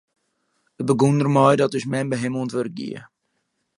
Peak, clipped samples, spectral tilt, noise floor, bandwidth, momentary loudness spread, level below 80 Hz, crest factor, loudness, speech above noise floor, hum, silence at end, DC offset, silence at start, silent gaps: -2 dBFS; under 0.1%; -7 dB/octave; -73 dBFS; 11.5 kHz; 15 LU; -66 dBFS; 20 dB; -20 LUFS; 53 dB; none; 0.7 s; under 0.1%; 0.8 s; none